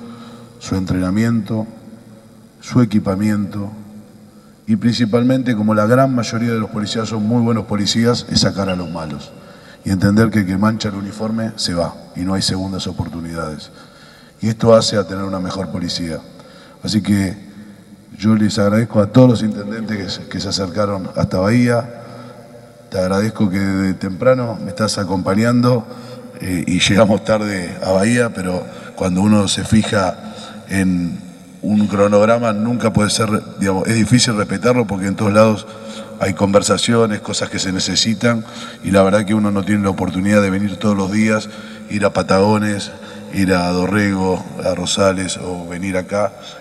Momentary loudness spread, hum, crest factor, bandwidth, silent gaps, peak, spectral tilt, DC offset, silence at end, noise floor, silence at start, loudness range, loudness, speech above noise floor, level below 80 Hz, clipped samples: 14 LU; none; 16 dB; 12.5 kHz; none; 0 dBFS; -5.5 dB/octave; under 0.1%; 0 s; -43 dBFS; 0 s; 4 LU; -17 LUFS; 27 dB; -46 dBFS; under 0.1%